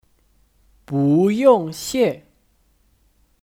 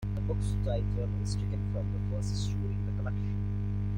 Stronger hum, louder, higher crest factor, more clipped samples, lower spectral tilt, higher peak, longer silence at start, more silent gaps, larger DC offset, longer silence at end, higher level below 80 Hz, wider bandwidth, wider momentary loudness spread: second, none vs 50 Hz at -30 dBFS; first, -18 LUFS vs -33 LUFS; first, 18 dB vs 12 dB; neither; about the same, -6.5 dB/octave vs -7.5 dB/octave; first, -2 dBFS vs -18 dBFS; first, 0.9 s vs 0 s; neither; neither; first, 1.3 s vs 0 s; second, -58 dBFS vs -38 dBFS; first, 17 kHz vs 10.5 kHz; first, 11 LU vs 2 LU